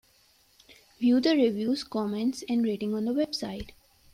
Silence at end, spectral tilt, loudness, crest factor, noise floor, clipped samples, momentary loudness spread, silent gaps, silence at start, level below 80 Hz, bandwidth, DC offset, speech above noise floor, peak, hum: 0.45 s; -5.5 dB/octave; -27 LUFS; 16 dB; -63 dBFS; under 0.1%; 11 LU; none; 0.7 s; -58 dBFS; 15 kHz; under 0.1%; 37 dB; -12 dBFS; none